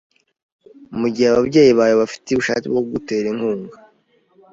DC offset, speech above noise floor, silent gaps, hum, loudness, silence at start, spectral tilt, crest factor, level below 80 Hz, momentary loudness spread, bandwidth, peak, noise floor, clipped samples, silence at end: under 0.1%; 42 dB; none; none; -17 LUFS; 0.9 s; -5.5 dB/octave; 16 dB; -54 dBFS; 11 LU; 7.8 kHz; -2 dBFS; -59 dBFS; under 0.1%; 0.8 s